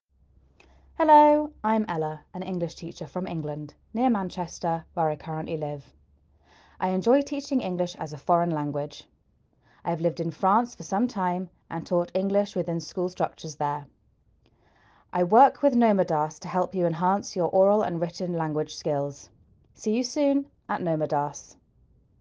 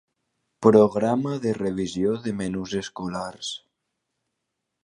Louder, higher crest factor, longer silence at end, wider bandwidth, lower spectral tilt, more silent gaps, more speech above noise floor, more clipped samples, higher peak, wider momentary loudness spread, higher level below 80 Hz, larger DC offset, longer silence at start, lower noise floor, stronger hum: about the same, -26 LUFS vs -24 LUFS; about the same, 20 dB vs 22 dB; second, 0.8 s vs 1.3 s; second, 7.8 kHz vs 10.5 kHz; about the same, -6.5 dB/octave vs -6 dB/octave; neither; second, 41 dB vs 58 dB; neither; second, -6 dBFS vs -2 dBFS; about the same, 12 LU vs 14 LU; about the same, -62 dBFS vs -58 dBFS; neither; first, 1 s vs 0.6 s; second, -66 dBFS vs -81 dBFS; neither